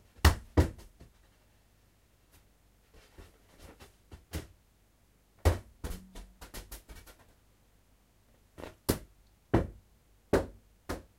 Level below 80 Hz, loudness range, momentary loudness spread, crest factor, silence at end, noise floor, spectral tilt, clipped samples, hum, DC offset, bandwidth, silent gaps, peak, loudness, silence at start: -42 dBFS; 16 LU; 26 LU; 30 dB; 0.15 s; -67 dBFS; -5.5 dB/octave; under 0.1%; none; under 0.1%; 16 kHz; none; -6 dBFS; -34 LUFS; 0.25 s